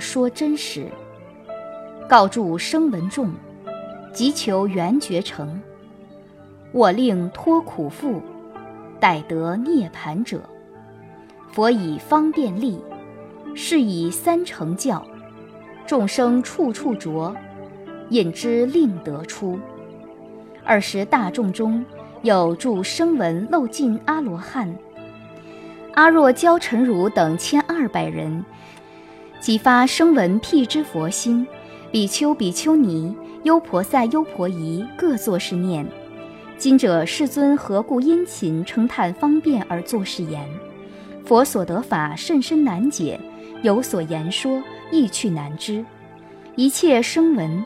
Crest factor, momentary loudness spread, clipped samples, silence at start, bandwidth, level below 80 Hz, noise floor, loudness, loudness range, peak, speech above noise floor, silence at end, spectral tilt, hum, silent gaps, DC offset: 20 dB; 21 LU; under 0.1%; 0 s; 16 kHz; -60 dBFS; -44 dBFS; -20 LUFS; 5 LU; 0 dBFS; 25 dB; 0 s; -5 dB/octave; none; none; under 0.1%